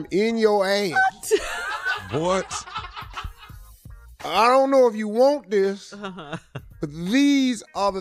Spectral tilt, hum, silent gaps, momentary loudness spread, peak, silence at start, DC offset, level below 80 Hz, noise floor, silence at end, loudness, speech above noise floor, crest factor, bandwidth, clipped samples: -4.5 dB/octave; none; none; 18 LU; -6 dBFS; 0 s; under 0.1%; -48 dBFS; -44 dBFS; 0 s; -21 LUFS; 23 dB; 16 dB; 15 kHz; under 0.1%